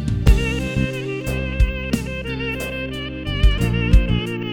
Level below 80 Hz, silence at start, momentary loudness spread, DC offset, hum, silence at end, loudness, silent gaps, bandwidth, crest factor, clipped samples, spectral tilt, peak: -22 dBFS; 0 s; 8 LU; under 0.1%; none; 0 s; -21 LUFS; none; 16 kHz; 18 dB; under 0.1%; -6 dB/octave; -2 dBFS